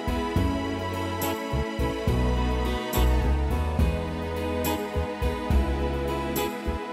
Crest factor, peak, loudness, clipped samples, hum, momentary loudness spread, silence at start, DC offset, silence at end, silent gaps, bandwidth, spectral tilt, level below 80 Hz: 14 dB; -12 dBFS; -27 LUFS; under 0.1%; none; 4 LU; 0 s; under 0.1%; 0 s; none; 15.5 kHz; -6 dB/octave; -30 dBFS